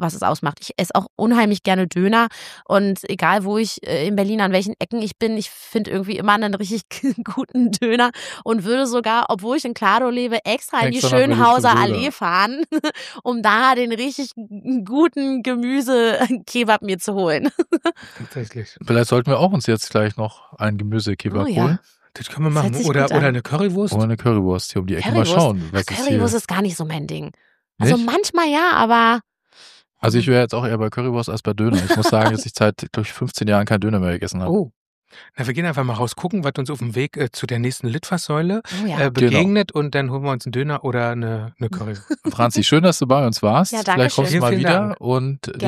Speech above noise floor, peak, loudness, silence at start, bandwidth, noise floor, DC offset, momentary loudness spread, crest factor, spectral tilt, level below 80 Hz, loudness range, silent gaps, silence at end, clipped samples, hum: 30 dB; 0 dBFS; -19 LUFS; 0 s; 15 kHz; -48 dBFS; under 0.1%; 10 LU; 18 dB; -5.5 dB/octave; -54 dBFS; 4 LU; 1.10-1.17 s, 34.76-35.02 s; 0 s; under 0.1%; none